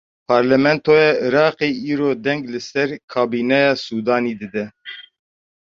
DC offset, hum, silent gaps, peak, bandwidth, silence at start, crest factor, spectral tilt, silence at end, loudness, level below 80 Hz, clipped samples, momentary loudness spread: under 0.1%; none; 3.04-3.08 s; -2 dBFS; 7.4 kHz; 0.3 s; 16 dB; -6 dB/octave; 0.75 s; -18 LUFS; -60 dBFS; under 0.1%; 13 LU